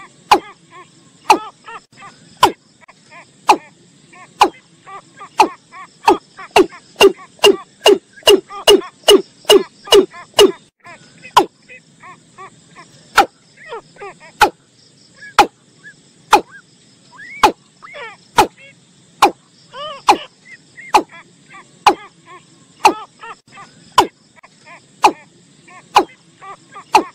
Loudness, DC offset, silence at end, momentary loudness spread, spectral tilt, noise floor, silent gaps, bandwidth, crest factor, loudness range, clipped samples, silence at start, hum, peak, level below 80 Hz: -14 LUFS; under 0.1%; 0.05 s; 23 LU; -2 dB/octave; -50 dBFS; none; 16 kHz; 18 dB; 8 LU; under 0.1%; 0.3 s; none; 0 dBFS; -50 dBFS